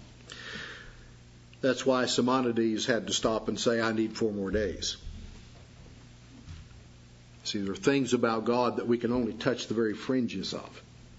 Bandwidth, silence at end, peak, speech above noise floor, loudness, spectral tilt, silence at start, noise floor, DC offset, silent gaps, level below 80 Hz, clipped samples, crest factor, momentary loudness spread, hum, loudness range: 8 kHz; 0 s; -10 dBFS; 24 dB; -29 LUFS; -4.5 dB/octave; 0 s; -53 dBFS; under 0.1%; none; -52 dBFS; under 0.1%; 20 dB; 20 LU; 60 Hz at -55 dBFS; 8 LU